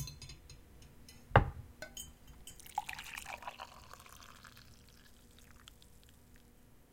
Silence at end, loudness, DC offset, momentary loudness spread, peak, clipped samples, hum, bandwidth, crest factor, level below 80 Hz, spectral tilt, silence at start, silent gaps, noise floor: 0.1 s; -39 LUFS; under 0.1%; 29 LU; -8 dBFS; under 0.1%; none; 17 kHz; 34 dB; -52 dBFS; -5 dB/octave; 0 s; none; -62 dBFS